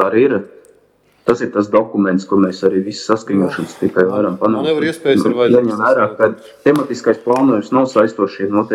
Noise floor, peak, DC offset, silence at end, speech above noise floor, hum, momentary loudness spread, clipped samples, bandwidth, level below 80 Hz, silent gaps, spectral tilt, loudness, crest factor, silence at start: -54 dBFS; 0 dBFS; under 0.1%; 0 s; 40 dB; none; 5 LU; under 0.1%; 13 kHz; -60 dBFS; none; -6.5 dB/octave; -15 LUFS; 14 dB; 0 s